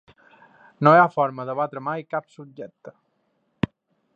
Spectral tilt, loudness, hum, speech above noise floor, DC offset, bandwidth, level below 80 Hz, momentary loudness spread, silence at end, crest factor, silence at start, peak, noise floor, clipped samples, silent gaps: -8.5 dB/octave; -22 LUFS; none; 49 dB; under 0.1%; 7.8 kHz; -58 dBFS; 24 LU; 1.25 s; 24 dB; 0.8 s; -2 dBFS; -70 dBFS; under 0.1%; none